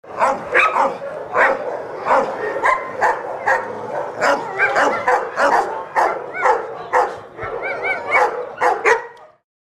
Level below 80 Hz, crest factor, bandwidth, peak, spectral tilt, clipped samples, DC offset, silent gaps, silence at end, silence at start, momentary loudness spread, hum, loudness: -56 dBFS; 18 dB; 14 kHz; -2 dBFS; -3.5 dB/octave; under 0.1%; under 0.1%; none; 0.4 s; 0.05 s; 10 LU; none; -18 LUFS